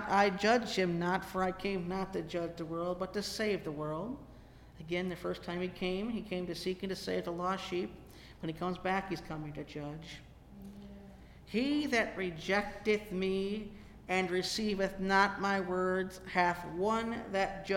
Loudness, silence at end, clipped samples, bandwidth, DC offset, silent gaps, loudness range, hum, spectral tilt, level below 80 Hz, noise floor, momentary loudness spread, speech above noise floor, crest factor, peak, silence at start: -35 LUFS; 0 s; under 0.1%; 16.5 kHz; under 0.1%; none; 6 LU; none; -5 dB/octave; -56 dBFS; -55 dBFS; 14 LU; 20 dB; 22 dB; -14 dBFS; 0 s